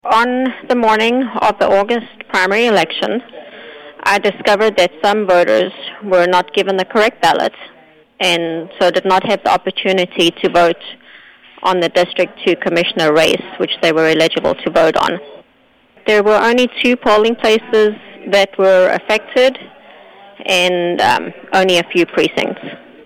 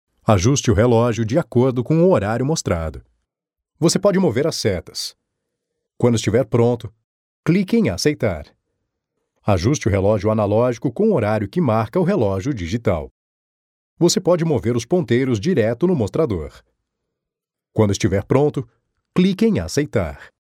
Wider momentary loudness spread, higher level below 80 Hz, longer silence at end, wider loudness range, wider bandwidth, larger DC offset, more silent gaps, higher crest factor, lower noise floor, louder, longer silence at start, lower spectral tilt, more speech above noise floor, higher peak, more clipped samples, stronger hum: about the same, 8 LU vs 10 LU; second, -52 dBFS vs -44 dBFS; about the same, 0.3 s vs 0.3 s; about the same, 2 LU vs 3 LU; about the same, 16.5 kHz vs 15.5 kHz; neither; second, none vs 7.04-7.43 s, 13.11-13.97 s; second, 12 dB vs 18 dB; second, -52 dBFS vs -85 dBFS; first, -14 LUFS vs -19 LUFS; second, 0.05 s vs 0.3 s; second, -4 dB/octave vs -6 dB/octave; second, 39 dB vs 67 dB; about the same, -2 dBFS vs 0 dBFS; neither; neither